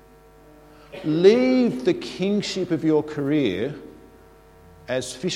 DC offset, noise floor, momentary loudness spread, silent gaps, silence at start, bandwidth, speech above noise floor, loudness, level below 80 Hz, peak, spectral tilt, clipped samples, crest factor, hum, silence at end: under 0.1%; -50 dBFS; 14 LU; none; 0.9 s; 12.5 kHz; 29 dB; -22 LUFS; -56 dBFS; -2 dBFS; -6 dB/octave; under 0.1%; 20 dB; none; 0 s